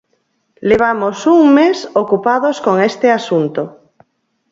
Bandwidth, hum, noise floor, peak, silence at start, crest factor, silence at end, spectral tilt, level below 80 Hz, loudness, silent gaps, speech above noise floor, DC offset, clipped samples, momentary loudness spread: 7.8 kHz; none; -64 dBFS; 0 dBFS; 0.6 s; 14 dB; 0.8 s; -6 dB/octave; -54 dBFS; -13 LUFS; none; 51 dB; under 0.1%; under 0.1%; 10 LU